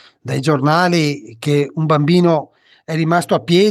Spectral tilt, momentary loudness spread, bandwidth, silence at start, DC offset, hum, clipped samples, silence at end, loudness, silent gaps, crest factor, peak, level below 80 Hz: -6.5 dB/octave; 7 LU; 13.5 kHz; 0.25 s; under 0.1%; none; under 0.1%; 0 s; -16 LUFS; none; 14 dB; -2 dBFS; -60 dBFS